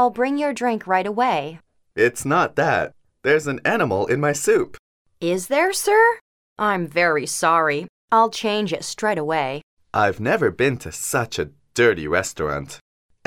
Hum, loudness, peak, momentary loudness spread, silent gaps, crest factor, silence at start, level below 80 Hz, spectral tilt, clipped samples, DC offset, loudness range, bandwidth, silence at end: none; -20 LUFS; -4 dBFS; 10 LU; 4.79-5.05 s, 6.21-6.56 s, 7.89-8.08 s, 9.63-9.77 s; 16 dB; 0 s; -54 dBFS; -4 dB/octave; under 0.1%; under 0.1%; 2 LU; 17 kHz; 0.5 s